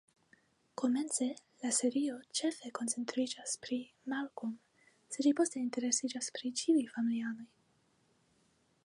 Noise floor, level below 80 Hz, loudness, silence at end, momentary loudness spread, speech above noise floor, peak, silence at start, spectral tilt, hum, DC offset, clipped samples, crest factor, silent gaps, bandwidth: -73 dBFS; -88 dBFS; -35 LUFS; 1.4 s; 10 LU; 38 dB; -16 dBFS; 0.8 s; -2.5 dB/octave; none; under 0.1%; under 0.1%; 20 dB; none; 11.5 kHz